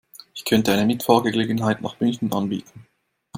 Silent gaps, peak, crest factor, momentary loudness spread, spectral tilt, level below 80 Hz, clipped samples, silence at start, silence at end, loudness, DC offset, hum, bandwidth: none; -2 dBFS; 20 dB; 11 LU; -5.5 dB/octave; -58 dBFS; under 0.1%; 0.35 s; 0 s; -21 LUFS; under 0.1%; none; 16.5 kHz